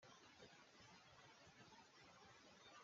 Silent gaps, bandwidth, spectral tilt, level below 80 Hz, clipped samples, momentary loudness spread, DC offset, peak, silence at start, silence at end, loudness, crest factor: none; 7.4 kHz; -2 dB/octave; -90 dBFS; under 0.1%; 1 LU; under 0.1%; -50 dBFS; 0 s; 0 s; -66 LUFS; 16 dB